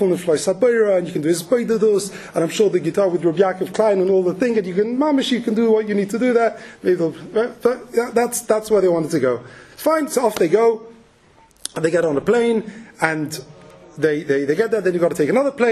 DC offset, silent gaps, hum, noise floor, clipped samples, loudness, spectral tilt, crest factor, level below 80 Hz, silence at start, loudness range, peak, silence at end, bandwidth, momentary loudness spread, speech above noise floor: under 0.1%; none; none; -52 dBFS; under 0.1%; -19 LUFS; -5 dB/octave; 18 dB; -60 dBFS; 0 s; 2 LU; 0 dBFS; 0 s; 13.5 kHz; 6 LU; 34 dB